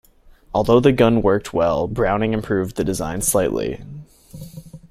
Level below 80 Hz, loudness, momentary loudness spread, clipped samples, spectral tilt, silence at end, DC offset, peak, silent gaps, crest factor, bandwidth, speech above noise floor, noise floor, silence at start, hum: -38 dBFS; -19 LUFS; 23 LU; under 0.1%; -5.5 dB/octave; 0.15 s; under 0.1%; 0 dBFS; none; 20 dB; 15.5 kHz; 30 dB; -48 dBFS; 0.55 s; none